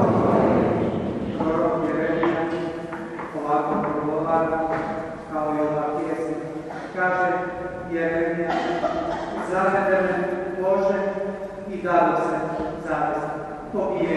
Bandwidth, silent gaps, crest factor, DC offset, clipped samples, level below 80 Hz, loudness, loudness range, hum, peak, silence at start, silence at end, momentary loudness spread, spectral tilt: 11.5 kHz; none; 18 dB; under 0.1%; under 0.1%; -50 dBFS; -24 LUFS; 3 LU; none; -6 dBFS; 0 s; 0 s; 10 LU; -7.5 dB/octave